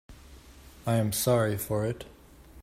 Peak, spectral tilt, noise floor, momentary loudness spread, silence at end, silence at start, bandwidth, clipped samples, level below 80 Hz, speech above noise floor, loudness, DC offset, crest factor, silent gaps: -12 dBFS; -5.5 dB/octave; -51 dBFS; 14 LU; 0 s; 0.1 s; 16 kHz; under 0.1%; -54 dBFS; 24 dB; -28 LUFS; under 0.1%; 18 dB; none